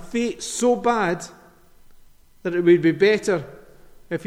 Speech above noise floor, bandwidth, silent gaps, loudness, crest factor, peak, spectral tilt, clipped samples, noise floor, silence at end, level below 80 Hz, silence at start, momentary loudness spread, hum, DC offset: 30 dB; 13.5 kHz; none; -21 LUFS; 18 dB; -6 dBFS; -5 dB/octave; under 0.1%; -50 dBFS; 0 s; -54 dBFS; 0 s; 15 LU; none; under 0.1%